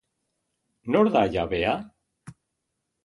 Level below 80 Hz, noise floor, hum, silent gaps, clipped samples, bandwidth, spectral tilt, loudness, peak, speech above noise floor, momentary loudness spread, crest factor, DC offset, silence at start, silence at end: -52 dBFS; -80 dBFS; none; none; under 0.1%; 11 kHz; -7 dB/octave; -24 LUFS; -6 dBFS; 57 dB; 10 LU; 20 dB; under 0.1%; 0.85 s; 0.7 s